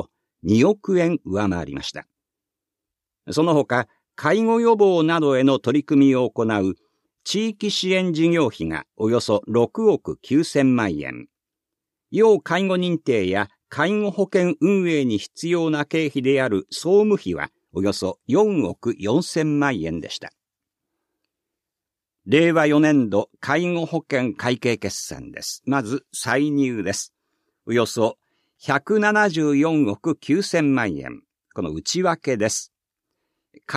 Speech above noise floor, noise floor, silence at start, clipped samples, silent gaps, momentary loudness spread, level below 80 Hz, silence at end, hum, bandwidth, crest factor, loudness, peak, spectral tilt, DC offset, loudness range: 67 dB; -87 dBFS; 0 s; under 0.1%; none; 12 LU; -56 dBFS; 0 s; none; 14 kHz; 18 dB; -21 LUFS; -4 dBFS; -5.5 dB/octave; under 0.1%; 5 LU